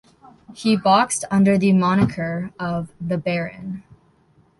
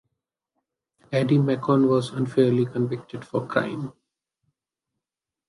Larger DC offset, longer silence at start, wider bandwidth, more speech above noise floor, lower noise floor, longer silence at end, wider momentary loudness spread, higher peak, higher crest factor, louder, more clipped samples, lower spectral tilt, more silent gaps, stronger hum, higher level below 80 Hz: neither; second, 0.5 s vs 1.1 s; about the same, 11.5 kHz vs 11.5 kHz; second, 38 dB vs 66 dB; second, -58 dBFS vs -89 dBFS; second, 0.8 s vs 1.6 s; about the same, 13 LU vs 11 LU; about the same, -4 dBFS vs -6 dBFS; about the same, 18 dB vs 20 dB; first, -20 LUFS vs -23 LUFS; neither; second, -5.5 dB/octave vs -8 dB/octave; neither; neither; first, -52 dBFS vs -66 dBFS